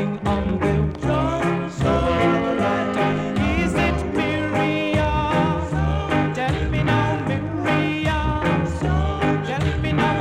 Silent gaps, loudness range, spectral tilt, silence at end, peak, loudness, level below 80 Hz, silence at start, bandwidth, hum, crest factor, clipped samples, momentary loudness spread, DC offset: none; 1 LU; -7 dB/octave; 0 s; -6 dBFS; -21 LUFS; -32 dBFS; 0 s; 11 kHz; none; 14 dB; under 0.1%; 3 LU; under 0.1%